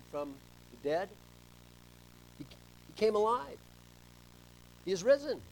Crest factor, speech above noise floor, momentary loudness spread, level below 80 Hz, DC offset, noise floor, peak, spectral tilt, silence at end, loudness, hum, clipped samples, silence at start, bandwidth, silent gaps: 20 dB; 24 dB; 24 LU; -64 dBFS; under 0.1%; -57 dBFS; -16 dBFS; -4.5 dB/octave; 0.05 s; -34 LUFS; 60 Hz at -60 dBFS; under 0.1%; 0.1 s; 19 kHz; none